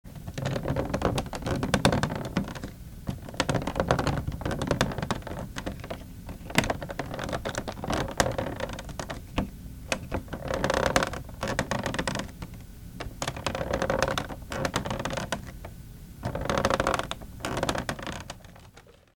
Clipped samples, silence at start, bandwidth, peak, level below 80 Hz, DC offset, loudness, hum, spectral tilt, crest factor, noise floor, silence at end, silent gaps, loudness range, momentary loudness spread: under 0.1%; 0.05 s; 20 kHz; -4 dBFS; -42 dBFS; under 0.1%; -30 LUFS; none; -4.5 dB/octave; 26 dB; -53 dBFS; 0.25 s; none; 2 LU; 14 LU